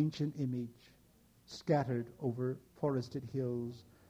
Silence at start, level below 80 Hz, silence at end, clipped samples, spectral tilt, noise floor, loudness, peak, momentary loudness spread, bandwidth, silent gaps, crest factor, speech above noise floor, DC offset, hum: 0 s; -72 dBFS; 0.25 s; under 0.1%; -8 dB/octave; -66 dBFS; -38 LUFS; -18 dBFS; 11 LU; 15.5 kHz; none; 18 dB; 29 dB; under 0.1%; none